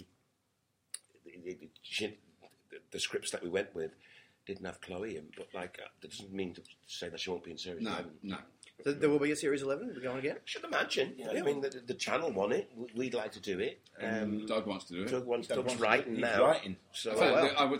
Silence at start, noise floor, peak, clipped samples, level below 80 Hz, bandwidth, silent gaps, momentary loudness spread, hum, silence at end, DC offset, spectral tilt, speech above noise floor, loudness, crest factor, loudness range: 0 s; -79 dBFS; -10 dBFS; under 0.1%; -74 dBFS; 16 kHz; none; 18 LU; none; 0 s; under 0.1%; -4 dB/octave; 44 dB; -35 LUFS; 26 dB; 10 LU